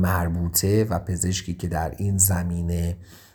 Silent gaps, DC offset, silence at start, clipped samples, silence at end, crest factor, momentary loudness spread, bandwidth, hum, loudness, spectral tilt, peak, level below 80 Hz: none; under 0.1%; 0 s; under 0.1%; 0.15 s; 18 dB; 8 LU; over 20 kHz; none; -23 LUFS; -4.5 dB/octave; -4 dBFS; -38 dBFS